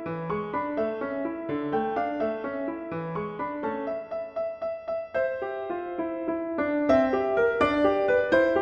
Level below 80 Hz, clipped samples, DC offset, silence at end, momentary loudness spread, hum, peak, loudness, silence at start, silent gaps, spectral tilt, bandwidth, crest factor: -56 dBFS; under 0.1%; under 0.1%; 0 s; 10 LU; none; -8 dBFS; -28 LUFS; 0 s; none; -7.5 dB/octave; 8.4 kHz; 18 dB